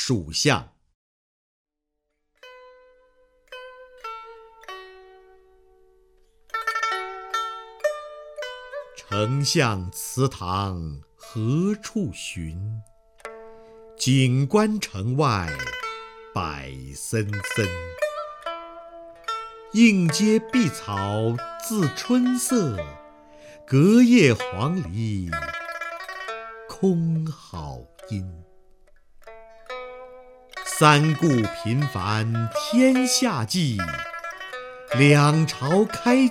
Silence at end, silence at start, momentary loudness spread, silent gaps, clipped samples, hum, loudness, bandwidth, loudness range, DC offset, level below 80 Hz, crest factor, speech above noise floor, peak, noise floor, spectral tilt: 0 s; 0 s; 21 LU; 0.95-1.65 s; under 0.1%; none; -23 LUFS; 16.5 kHz; 14 LU; under 0.1%; -52 dBFS; 22 dB; 58 dB; -2 dBFS; -79 dBFS; -5 dB/octave